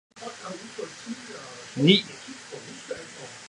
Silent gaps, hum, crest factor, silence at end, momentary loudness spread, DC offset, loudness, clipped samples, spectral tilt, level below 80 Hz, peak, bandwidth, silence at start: none; none; 28 dB; 0 s; 20 LU; under 0.1%; -26 LUFS; under 0.1%; -4.5 dB/octave; -72 dBFS; -2 dBFS; 11.5 kHz; 0.15 s